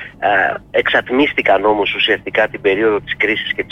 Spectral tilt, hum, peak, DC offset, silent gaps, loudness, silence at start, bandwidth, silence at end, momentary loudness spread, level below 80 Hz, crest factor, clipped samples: -5.5 dB/octave; none; -4 dBFS; under 0.1%; none; -15 LUFS; 0 s; 6.8 kHz; 0.05 s; 3 LU; -46 dBFS; 12 dB; under 0.1%